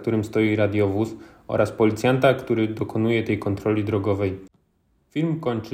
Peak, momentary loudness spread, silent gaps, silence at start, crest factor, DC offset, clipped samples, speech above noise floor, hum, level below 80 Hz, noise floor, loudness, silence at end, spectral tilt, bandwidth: -4 dBFS; 8 LU; none; 0 s; 20 dB; under 0.1%; under 0.1%; 44 dB; none; -54 dBFS; -66 dBFS; -23 LUFS; 0 s; -7.5 dB/octave; 15.5 kHz